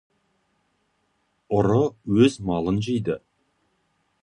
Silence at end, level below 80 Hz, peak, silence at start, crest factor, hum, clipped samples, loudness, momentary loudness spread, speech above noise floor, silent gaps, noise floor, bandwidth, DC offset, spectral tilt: 1.05 s; -50 dBFS; -6 dBFS; 1.5 s; 20 dB; none; under 0.1%; -23 LUFS; 8 LU; 49 dB; none; -70 dBFS; 10.5 kHz; under 0.1%; -7 dB/octave